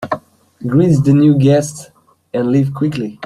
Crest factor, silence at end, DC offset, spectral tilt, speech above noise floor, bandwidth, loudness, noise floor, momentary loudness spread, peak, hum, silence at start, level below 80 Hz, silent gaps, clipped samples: 12 dB; 0 s; under 0.1%; -7.5 dB/octave; 22 dB; 12 kHz; -14 LUFS; -35 dBFS; 15 LU; -2 dBFS; none; 0 s; -50 dBFS; none; under 0.1%